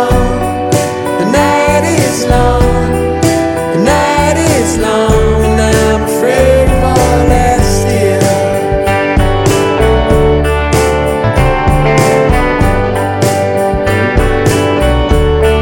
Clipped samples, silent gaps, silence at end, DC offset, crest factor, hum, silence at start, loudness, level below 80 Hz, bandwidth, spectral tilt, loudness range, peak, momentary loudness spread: under 0.1%; none; 0 s; under 0.1%; 10 dB; none; 0 s; -10 LUFS; -16 dBFS; 17 kHz; -5.5 dB/octave; 1 LU; 0 dBFS; 3 LU